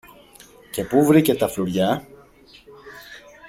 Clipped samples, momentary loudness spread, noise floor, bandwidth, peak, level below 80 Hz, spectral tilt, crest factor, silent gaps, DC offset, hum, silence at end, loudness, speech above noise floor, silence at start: under 0.1%; 25 LU; -49 dBFS; 16.5 kHz; -4 dBFS; -54 dBFS; -6 dB/octave; 20 dB; none; under 0.1%; none; 0.3 s; -20 LUFS; 31 dB; 0.75 s